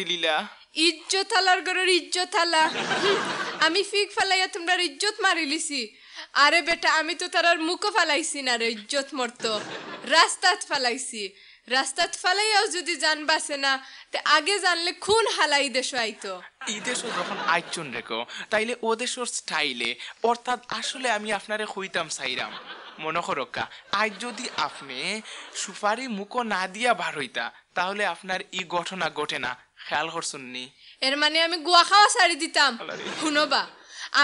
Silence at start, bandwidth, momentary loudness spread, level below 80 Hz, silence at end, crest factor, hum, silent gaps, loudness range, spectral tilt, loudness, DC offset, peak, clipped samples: 0 s; 11 kHz; 12 LU; -70 dBFS; 0 s; 22 dB; none; none; 8 LU; -1 dB/octave; -24 LUFS; under 0.1%; -4 dBFS; under 0.1%